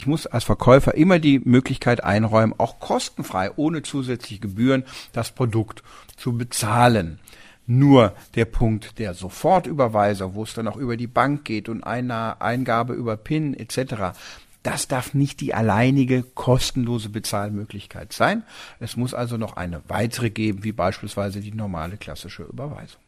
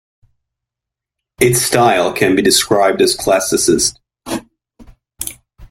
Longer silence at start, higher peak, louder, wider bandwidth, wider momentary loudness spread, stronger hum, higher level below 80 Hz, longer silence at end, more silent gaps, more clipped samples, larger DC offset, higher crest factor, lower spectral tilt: second, 0 s vs 1.4 s; about the same, -2 dBFS vs 0 dBFS; second, -22 LUFS vs -13 LUFS; about the same, 15.5 kHz vs 16.5 kHz; about the same, 15 LU vs 14 LU; neither; first, -40 dBFS vs -46 dBFS; first, 0.2 s vs 0.05 s; neither; neither; neither; about the same, 20 dB vs 16 dB; first, -6 dB/octave vs -3 dB/octave